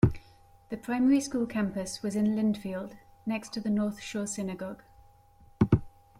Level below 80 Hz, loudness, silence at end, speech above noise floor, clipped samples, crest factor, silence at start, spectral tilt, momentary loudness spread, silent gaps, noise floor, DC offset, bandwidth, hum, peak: -50 dBFS; -30 LUFS; 0.3 s; 28 dB; under 0.1%; 22 dB; 0.05 s; -6.5 dB/octave; 14 LU; none; -58 dBFS; under 0.1%; 14.5 kHz; none; -8 dBFS